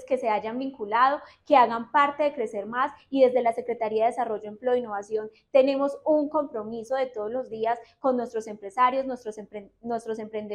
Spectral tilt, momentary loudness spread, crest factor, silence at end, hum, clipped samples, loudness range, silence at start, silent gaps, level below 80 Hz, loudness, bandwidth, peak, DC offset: -5 dB/octave; 12 LU; 18 dB; 0 s; none; under 0.1%; 5 LU; 0 s; none; -70 dBFS; -26 LUFS; 11.5 kHz; -8 dBFS; under 0.1%